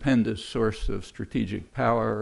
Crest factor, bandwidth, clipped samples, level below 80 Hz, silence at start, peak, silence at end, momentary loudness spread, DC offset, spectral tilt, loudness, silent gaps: 16 dB; 11.5 kHz; under 0.1%; -38 dBFS; 0 s; -10 dBFS; 0 s; 10 LU; under 0.1%; -7 dB/octave; -28 LUFS; none